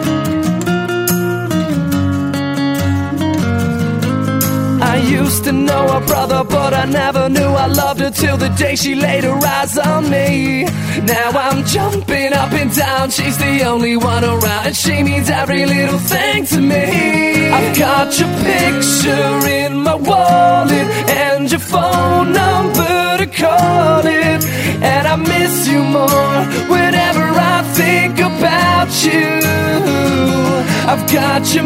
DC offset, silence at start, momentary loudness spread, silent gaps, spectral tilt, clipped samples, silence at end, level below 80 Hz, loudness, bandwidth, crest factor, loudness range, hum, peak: under 0.1%; 0 s; 4 LU; none; -4.5 dB/octave; under 0.1%; 0 s; -42 dBFS; -13 LUFS; 16.5 kHz; 12 dB; 2 LU; none; 0 dBFS